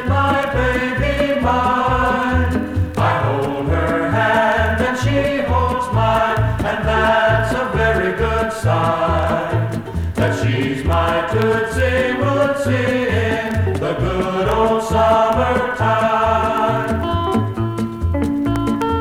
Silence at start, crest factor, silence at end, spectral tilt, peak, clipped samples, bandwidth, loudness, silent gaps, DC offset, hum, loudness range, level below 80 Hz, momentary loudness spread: 0 s; 16 dB; 0 s; -6.5 dB/octave; -2 dBFS; under 0.1%; 16 kHz; -17 LUFS; none; under 0.1%; none; 2 LU; -30 dBFS; 5 LU